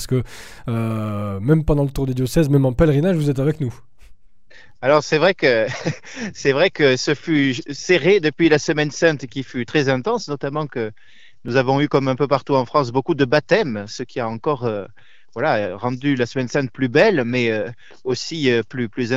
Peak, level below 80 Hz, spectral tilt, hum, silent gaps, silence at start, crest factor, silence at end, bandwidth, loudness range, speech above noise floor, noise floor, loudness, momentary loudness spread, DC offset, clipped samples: -2 dBFS; -40 dBFS; -6 dB/octave; none; none; 0 s; 18 dB; 0 s; 15.5 kHz; 3 LU; 31 dB; -50 dBFS; -19 LUFS; 11 LU; 0.9%; under 0.1%